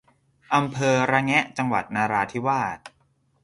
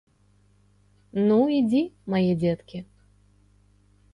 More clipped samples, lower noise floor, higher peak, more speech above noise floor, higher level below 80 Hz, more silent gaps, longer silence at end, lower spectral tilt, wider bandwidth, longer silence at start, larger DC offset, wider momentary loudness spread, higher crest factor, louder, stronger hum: neither; first, -65 dBFS vs -61 dBFS; first, -4 dBFS vs -10 dBFS; about the same, 42 dB vs 39 dB; about the same, -60 dBFS vs -60 dBFS; neither; second, 0.55 s vs 1.3 s; second, -5 dB/octave vs -9 dB/octave; about the same, 11.5 kHz vs 10.5 kHz; second, 0.5 s vs 1.15 s; neither; second, 6 LU vs 14 LU; about the same, 20 dB vs 16 dB; about the same, -23 LUFS vs -24 LUFS; second, none vs 50 Hz at -50 dBFS